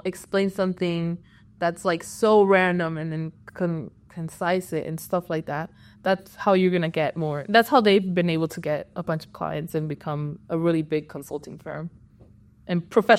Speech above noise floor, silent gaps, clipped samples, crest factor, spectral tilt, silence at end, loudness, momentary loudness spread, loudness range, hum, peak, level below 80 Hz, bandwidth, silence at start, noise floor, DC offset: 29 dB; none; under 0.1%; 20 dB; -6 dB/octave; 0 s; -24 LUFS; 16 LU; 7 LU; none; -4 dBFS; -60 dBFS; 15.5 kHz; 0.05 s; -52 dBFS; under 0.1%